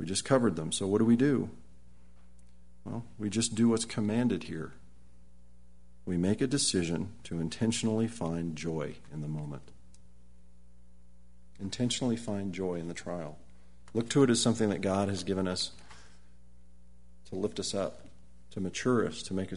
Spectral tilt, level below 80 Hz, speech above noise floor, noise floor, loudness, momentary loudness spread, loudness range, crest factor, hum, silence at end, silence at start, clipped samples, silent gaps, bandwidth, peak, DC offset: -5 dB/octave; -58 dBFS; 29 dB; -60 dBFS; -31 LUFS; 15 LU; 7 LU; 22 dB; 60 Hz at -55 dBFS; 0 s; 0 s; under 0.1%; none; 11 kHz; -10 dBFS; 0.4%